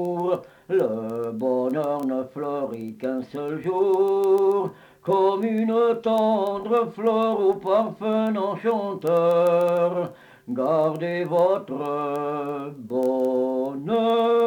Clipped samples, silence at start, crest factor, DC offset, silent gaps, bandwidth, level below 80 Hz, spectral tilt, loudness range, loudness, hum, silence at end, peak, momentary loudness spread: under 0.1%; 0 s; 14 dB; under 0.1%; none; 18.5 kHz; -70 dBFS; -7.5 dB/octave; 4 LU; -23 LUFS; none; 0 s; -10 dBFS; 9 LU